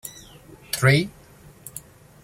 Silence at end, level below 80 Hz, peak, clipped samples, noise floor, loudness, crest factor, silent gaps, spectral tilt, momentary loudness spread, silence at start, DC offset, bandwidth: 0.45 s; -54 dBFS; -4 dBFS; under 0.1%; -49 dBFS; -21 LUFS; 22 dB; none; -5 dB/octave; 24 LU; 0.05 s; under 0.1%; 16.5 kHz